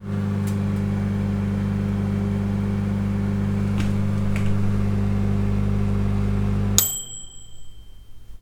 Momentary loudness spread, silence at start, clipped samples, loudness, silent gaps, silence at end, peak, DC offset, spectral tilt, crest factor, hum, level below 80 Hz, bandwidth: 3 LU; 0 s; under 0.1%; -23 LUFS; none; 0 s; 0 dBFS; under 0.1%; -5.5 dB/octave; 22 dB; none; -32 dBFS; 18.5 kHz